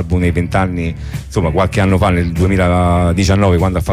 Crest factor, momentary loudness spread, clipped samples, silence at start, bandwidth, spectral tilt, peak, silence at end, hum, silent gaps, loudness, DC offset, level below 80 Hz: 10 dB; 7 LU; under 0.1%; 0 s; 14 kHz; -7 dB/octave; -2 dBFS; 0 s; none; none; -14 LUFS; under 0.1%; -26 dBFS